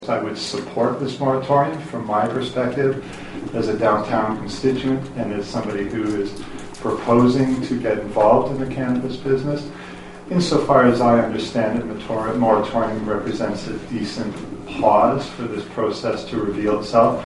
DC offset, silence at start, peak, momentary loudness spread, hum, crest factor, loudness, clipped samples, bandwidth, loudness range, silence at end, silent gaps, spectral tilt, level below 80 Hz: under 0.1%; 0 s; 0 dBFS; 12 LU; none; 20 dB; -20 LUFS; under 0.1%; 11.5 kHz; 4 LU; 0 s; none; -6.5 dB/octave; -46 dBFS